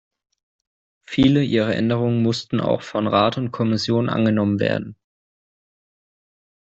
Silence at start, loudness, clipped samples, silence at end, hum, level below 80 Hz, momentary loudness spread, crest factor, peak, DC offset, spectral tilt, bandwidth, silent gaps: 1.1 s; -20 LUFS; under 0.1%; 1.7 s; none; -52 dBFS; 6 LU; 18 dB; -4 dBFS; under 0.1%; -7 dB/octave; 8 kHz; none